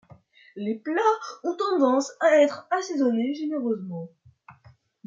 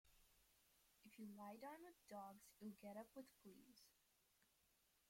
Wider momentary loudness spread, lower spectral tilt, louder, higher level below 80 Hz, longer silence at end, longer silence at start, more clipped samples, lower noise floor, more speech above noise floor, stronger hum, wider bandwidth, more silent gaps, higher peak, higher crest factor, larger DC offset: about the same, 12 LU vs 10 LU; about the same, -5 dB/octave vs -5 dB/octave; first, -24 LUFS vs -61 LUFS; first, -78 dBFS vs -88 dBFS; first, 0.55 s vs 0 s; first, 0.55 s vs 0.05 s; neither; second, -57 dBFS vs -82 dBFS; first, 33 dB vs 22 dB; neither; second, 7.8 kHz vs 16.5 kHz; neither; first, -8 dBFS vs -46 dBFS; about the same, 18 dB vs 16 dB; neither